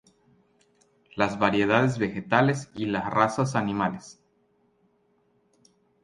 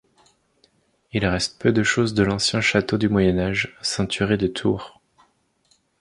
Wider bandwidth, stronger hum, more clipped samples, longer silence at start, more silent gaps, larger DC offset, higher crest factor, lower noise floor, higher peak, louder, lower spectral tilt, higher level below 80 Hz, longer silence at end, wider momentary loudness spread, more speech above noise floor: about the same, 11 kHz vs 11.5 kHz; neither; neither; about the same, 1.15 s vs 1.15 s; neither; neither; about the same, 22 dB vs 18 dB; about the same, -67 dBFS vs -64 dBFS; about the same, -6 dBFS vs -4 dBFS; second, -25 LUFS vs -21 LUFS; about the same, -6 dB/octave vs -5 dB/octave; second, -60 dBFS vs -44 dBFS; first, 1.9 s vs 1.1 s; about the same, 8 LU vs 6 LU; about the same, 43 dB vs 43 dB